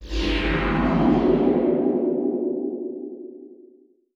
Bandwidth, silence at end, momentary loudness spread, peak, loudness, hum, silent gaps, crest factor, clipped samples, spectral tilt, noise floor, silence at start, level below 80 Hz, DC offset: 7.6 kHz; 0.6 s; 15 LU; -8 dBFS; -22 LUFS; none; none; 16 dB; under 0.1%; -7.5 dB/octave; -54 dBFS; 0 s; -34 dBFS; under 0.1%